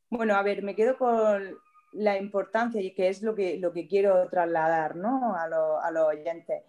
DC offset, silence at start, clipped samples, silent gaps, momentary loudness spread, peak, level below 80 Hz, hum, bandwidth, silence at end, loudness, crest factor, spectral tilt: under 0.1%; 0.1 s; under 0.1%; none; 6 LU; -10 dBFS; -76 dBFS; none; 10.5 kHz; 0.1 s; -27 LUFS; 16 dB; -6.5 dB/octave